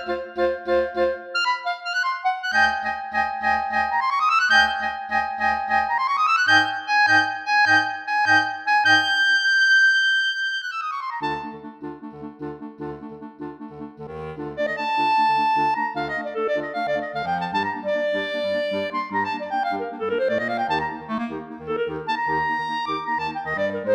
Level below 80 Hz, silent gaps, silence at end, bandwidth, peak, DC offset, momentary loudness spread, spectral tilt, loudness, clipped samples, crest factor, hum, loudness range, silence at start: -56 dBFS; none; 0 s; 15 kHz; -4 dBFS; under 0.1%; 18 LU; -3 dB/octave; -21 LUFS; under 0.1%; 18 dB; none; 9 LU; 0 s